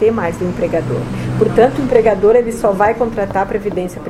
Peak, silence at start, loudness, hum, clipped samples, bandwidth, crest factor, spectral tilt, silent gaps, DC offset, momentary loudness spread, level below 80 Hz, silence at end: 0 dBFS; 0 s; -15 LUFS; none; under 0.1%; 13 kHz; 14 dB; -7 dB/octave; none; under 0.1%; 8 LU; -36 dBFS; 0 s